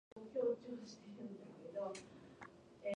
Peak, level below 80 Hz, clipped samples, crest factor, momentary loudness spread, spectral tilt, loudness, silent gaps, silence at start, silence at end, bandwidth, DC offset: -28 dBFS; -82 dBFS; under 0.1%; 18 dB; 18 LU; -5.5 dB/octave; -46 LUFS; none; 0.15 s; 0.05 s; 10.5 kHz; under 0.1%